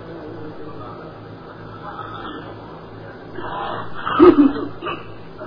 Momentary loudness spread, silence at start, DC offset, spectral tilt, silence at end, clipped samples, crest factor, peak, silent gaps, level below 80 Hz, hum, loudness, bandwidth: 25 LU; 0 s; under 0.1%; -9.5 dB/octave; 0 s; under 0.1%; 22 dB; 0 dBFS; none; -48 dBFS; none; -17 LUFS; 5.2 kHz